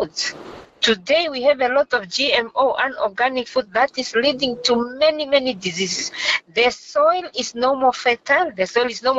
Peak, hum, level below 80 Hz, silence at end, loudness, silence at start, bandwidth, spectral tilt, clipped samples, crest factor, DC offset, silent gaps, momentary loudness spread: -4 dBFS; none; -58 dBFS; 0 s; -19 LUFS; 0 s; 8 kHz; -2 dB/octave; under 0.1%; 16 dB; under 0.1%; none; 6 LU